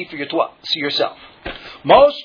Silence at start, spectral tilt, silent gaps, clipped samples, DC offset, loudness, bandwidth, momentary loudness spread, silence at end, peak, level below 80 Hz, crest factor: 0 s; -5 dB/octave; none; under 0.1%; under 0.1%; -17 LUFS; 5.4 kHz; 20 LU; 0 s; 0 dBFS; -48 dBFS; 18 dB